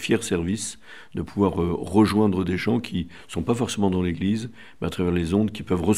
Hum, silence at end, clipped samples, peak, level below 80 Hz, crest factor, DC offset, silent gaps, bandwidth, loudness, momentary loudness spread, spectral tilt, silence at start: none; 0 s; under 0.1%; -4 dBFS; -50 dBFS; 18 dB; 0.5%; none; 15 kHz; -24 LUFS; 12 LU; -6 dB/octave; 0 s